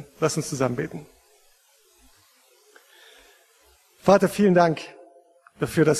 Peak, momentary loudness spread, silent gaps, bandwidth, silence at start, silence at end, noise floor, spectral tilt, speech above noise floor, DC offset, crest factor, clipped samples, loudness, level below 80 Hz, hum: -4 dBFS; 15 LU; none; 13.5 kHz; 0 s; 0 s; -60 dBFS; -5.5 dB/octave; 39 dB; under 0.1%; 22 dB; under 0.1%; -22 LUFS; -60 dBFS; none